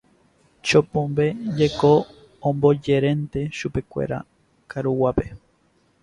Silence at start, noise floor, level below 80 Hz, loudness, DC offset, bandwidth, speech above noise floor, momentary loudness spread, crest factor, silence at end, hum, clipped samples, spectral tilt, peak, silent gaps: 0.65 s; -62 dBFS; -46 dBFS; -22 LUFS; under 0.1%; 11 kHz; 42 dB; 11 LU; 20 dB; 0.65 s; none; under 0.1%; -6.5 dB/octave; -4 dBFS; none